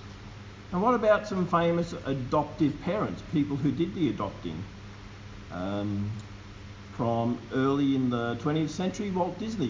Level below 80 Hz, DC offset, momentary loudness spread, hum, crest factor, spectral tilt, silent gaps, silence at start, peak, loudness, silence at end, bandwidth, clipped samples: -50 dBFS; under 0.1%; 19 LU; none; 18 dB; -7 dB/octave; none; 0 s; -12 dBFS; -29 LUFS; 0 s; 7.6 kHz; under 0.1%